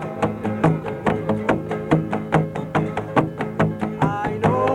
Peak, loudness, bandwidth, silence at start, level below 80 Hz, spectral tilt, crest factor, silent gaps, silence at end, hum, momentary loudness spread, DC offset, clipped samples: -2 dBFS; -22 LUFS; 10.5 kHz; 0 s; -46 dBFS; -8 dB/octave; 18 dB; none; 0 s; none; 3 LU; under 0.1%; under 0.1%